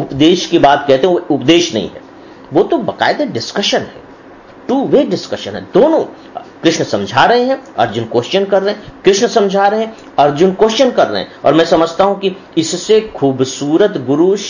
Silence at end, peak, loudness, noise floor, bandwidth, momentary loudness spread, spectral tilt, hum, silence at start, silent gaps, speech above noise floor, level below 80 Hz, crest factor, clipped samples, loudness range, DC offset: 0 s; 0 dBFS; -13 LUFS; -37 dBFS; 7.4 kHz; 8 LU; -4.5 dB/octave; none; 0 s; none; 25 dB; -48 dBFS; 12 dB; under 0.1%; 3 LU; under 0.1%